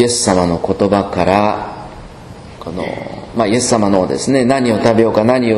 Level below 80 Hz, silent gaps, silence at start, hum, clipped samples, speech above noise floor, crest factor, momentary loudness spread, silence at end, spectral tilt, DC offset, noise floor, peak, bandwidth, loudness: -40 dBFS; none; 0 s; none; 0.3%; 20 dB; 14 dB; 19 LU; 0 s; -5 dB/octave; under 0.1%; -33 dBFS; 0 dBFS; 12.5 kHz; -14 LUFS